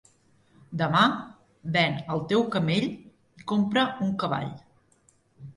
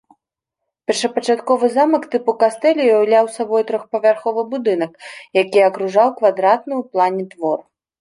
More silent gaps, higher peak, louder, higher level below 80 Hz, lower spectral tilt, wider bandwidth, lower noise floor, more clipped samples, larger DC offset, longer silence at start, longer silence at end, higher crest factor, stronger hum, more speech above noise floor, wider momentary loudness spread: neither; second, -8 dBFS vs -2 dBFS; second, -26 LUFS vs -17 LUFS; first, -62 dBFS vs -72 dBFS; first, -6.5 dB/octave vs -4.5 dB/octave; about the same, 11 kHz vs 11.5 kHz; second, -64 dBFS vs -81 dBFS; neither; neither; second, 0.7 s vs 0.9 s; second, 0.05 s vs 0.4 s; about the same, 20 dB vs 16 dB; neither; second, 39 dB vs 65 dB; first, 16 LU vs 8 LU